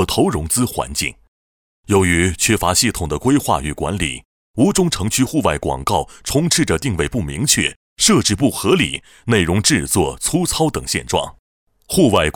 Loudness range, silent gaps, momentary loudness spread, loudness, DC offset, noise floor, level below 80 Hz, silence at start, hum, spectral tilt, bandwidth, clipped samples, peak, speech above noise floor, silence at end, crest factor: 2 LU; 1.28-1.83 s, 4.25-4.54 s, 7.76-7.96 s, 11.39-11.67 s; 7 LU; -17 LUFS; under 0.1%; under -90 dBFS; -36 dBFS; 0 s; none; -4 dB/octave; 19 kHz; under 0.1%; -2 dBFS; over 73 dB; 0.05 s; 16 dB